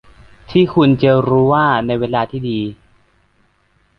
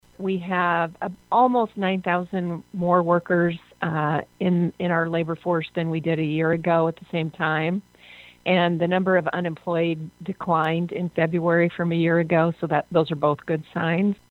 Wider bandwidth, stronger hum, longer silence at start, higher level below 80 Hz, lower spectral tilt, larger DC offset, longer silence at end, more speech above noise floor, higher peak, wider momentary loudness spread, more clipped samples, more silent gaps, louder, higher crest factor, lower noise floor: first, 5.8 kHz vs 4.3 kHz; neither; first, 0.5 s vs 0.2 s; first, -46 dBFS vs -62 dBFS; about the same, -9.5 dB/octave vs -8.5 dB/octave; neither; first, 1.25 s vs 0.15 s; first, 44 dB vs 25 dB; first, -2 dBFS vs -6 dBFS; about the same, 9 LU vs 8 LU; neither; neither; first, -15 LUFS vs -23 LUFS; about the same, 14 dB vs 18 dB; first, -58 dBFS vs -48 dBFS